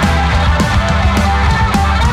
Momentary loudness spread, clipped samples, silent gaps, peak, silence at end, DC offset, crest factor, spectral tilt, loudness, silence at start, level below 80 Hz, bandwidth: 0 LU; under 0.1%; none; -2 dBFS; 0 s; under 0.1%; 8 dB; -5.5 dB/octave; -13 LUFS; 0 s; -16 dBFS; 13.5 kHz